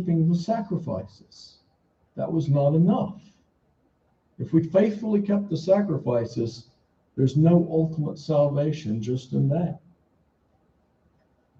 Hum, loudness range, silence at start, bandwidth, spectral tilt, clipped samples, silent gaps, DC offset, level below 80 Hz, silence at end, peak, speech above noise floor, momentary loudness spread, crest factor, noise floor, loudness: none; 4 LU; 0 s; 7.4 kHz; -9 dB/octave; under 0.1%; none; under 0.1%; -60 dBFS; 1.85 s; -8 dBFS; 44 dB; 13 LU; 18 dB; -67 dBFS; -24 LUFS